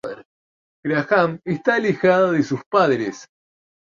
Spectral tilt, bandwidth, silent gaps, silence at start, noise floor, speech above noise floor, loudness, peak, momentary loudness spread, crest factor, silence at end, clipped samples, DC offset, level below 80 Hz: -6.5 dB/octave; 7.4 kHz; 0.25-0.83 s, 2.66-2.71 s; 0.05 s; under -90 dBFS; over 71 dB; -19 LUFS; -2 dBFS; 15 LU; 18 dB; 0.75 s; under 0.1%; under 0.1%; -64 dBFS